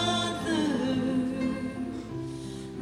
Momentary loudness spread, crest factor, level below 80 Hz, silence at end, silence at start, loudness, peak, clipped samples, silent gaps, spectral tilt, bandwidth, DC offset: 10 LU; 14 dB; -54 dBFS; 0 s; 0 s; -30 LUFS; -16 dBFS; under 0.1%; none; -5 dB/octave; 14 kHz; under 0.1%